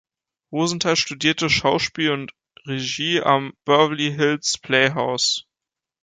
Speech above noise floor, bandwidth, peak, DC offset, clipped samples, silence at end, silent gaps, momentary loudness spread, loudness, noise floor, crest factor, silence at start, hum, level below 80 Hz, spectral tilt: 67 dB; 9.6 kHz; -4 dBFS; under 0.1%; under 0.1%; 0.6 s; none; 9 LU; -20 LUFS; -87 dBFS; 18 dB; 0.5 s; none; -54 dBFS; -3.5 dB/octave